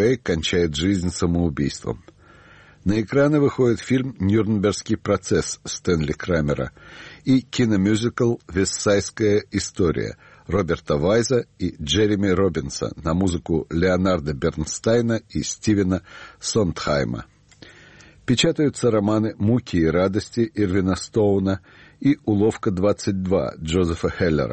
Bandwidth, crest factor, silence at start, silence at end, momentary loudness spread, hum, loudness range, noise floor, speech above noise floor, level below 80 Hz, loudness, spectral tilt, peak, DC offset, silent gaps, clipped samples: 8.8 kHz; 14 dB; 0 s; 0 s; 8 LU; none; 2 LU; -49 dBFS; 28 dB; -42 dBFS; -22 LUFS; -5.5 dB/octave; -6 dBFS; under 0.1%; none; under 0.1%